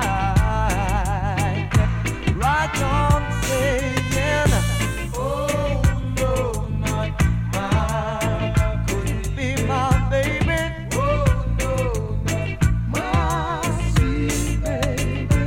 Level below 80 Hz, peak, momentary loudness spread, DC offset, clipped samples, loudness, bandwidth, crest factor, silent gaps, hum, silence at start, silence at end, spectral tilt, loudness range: -26 dBFS; -4 dBFS; 5 LU; under 0.1%; under 0.1%; -22 LUFS; 17 kHz; 16 dB; none; none; 0 s; 0 s; -5.5 dB/octave; 2 LU